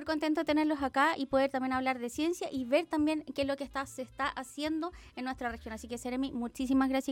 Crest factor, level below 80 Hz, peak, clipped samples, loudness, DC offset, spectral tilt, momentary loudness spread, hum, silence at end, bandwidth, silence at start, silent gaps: 18 dB; -58 dBFS; -16 dBFS; under 0.1%; -33 LUFS; under 0.1%; -4 dB/octave; 10 LU; none; 0 s; 16.5 kHz; 0 s; none